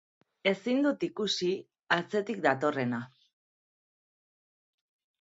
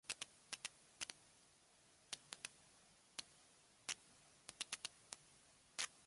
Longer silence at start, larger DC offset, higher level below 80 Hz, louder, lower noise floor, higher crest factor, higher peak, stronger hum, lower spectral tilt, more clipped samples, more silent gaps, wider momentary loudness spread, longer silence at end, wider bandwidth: first, 0.45 s vs 0.05 s; neither; first, -80 dBFS vs -86 dBFS; first, -30 LUFS vs -52 LUFS; first, under -90 dBFS vs -72 dBFS; second, 22 dB vs 32 dB; first, -10 dBFS vs -22 dBFS; neither; first, -5 dB/octave vs 1 dB/octave; neither; neither; second, 7 LU vs 20 LU; first, 2.15 s vs 0 s; second, 8 kHz vs 11.5 kHz